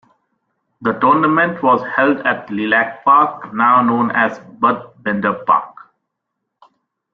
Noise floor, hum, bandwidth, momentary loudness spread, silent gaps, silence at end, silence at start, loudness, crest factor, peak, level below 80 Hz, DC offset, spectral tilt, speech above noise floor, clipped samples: -76 dBFS; none; 6.4 kHz; 8 LU; none; 1.4 s; 0.8 s; -15 LUFS; 16 dB; -2 dBFS; -62 dBFS; under 0.1%; -8 dB/octave; 61 dB; under 0.1%